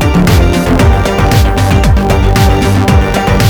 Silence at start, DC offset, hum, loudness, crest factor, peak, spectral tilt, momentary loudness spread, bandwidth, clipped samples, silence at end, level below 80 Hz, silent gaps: 0 s; under 0.1%; none; -9 LUFS; 8 dB; 0 dBFS; -6 dB/octave; 1 LU; 20 kHz; under 0.1%; 0 s; -12 dBFS; none